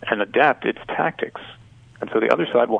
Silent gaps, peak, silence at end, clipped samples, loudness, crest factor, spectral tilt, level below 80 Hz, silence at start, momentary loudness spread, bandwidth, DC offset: none; -2 dBFS; 0 s; under 0.1%; -21 LUFS; 20 dB; -6.5 dB/octave; -60 dBFS; 0 s; 16 LU; 8 kHz; under 0.1%